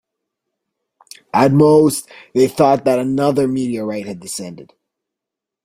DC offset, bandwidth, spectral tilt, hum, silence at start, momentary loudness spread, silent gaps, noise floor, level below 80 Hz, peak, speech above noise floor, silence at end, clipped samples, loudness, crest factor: under 0.1%; 16 kHz; -6 dB/octave; none; 1.35 s; 15 LU; none; -84 dBFS; -56 dBFS; -2 dBFS; 69 dB; 1 s; under 0.1%; -15 LUFS; 16 dB